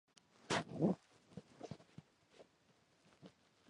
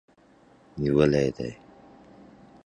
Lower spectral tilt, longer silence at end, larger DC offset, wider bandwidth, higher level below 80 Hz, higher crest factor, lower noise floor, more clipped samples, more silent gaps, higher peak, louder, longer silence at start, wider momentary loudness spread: second, -5.5 dB/octave vs -7.5 dB/octave; second, 0.4 s vs 1.1 s; neither; about the same, 11 kHz vs 10 kHz; second, -76 dBFS vs -50 dBFS; about the same, 24 dB vs 22 dB; first, -74 dBFS vs -57 dBFS; neither; neither; second, -22 dBFS vs -6 dBFS; second, -42 LUFS vs -25 LUFS; second, 0.5 s vs 0.75 s; first, 25 LU vs 16 LU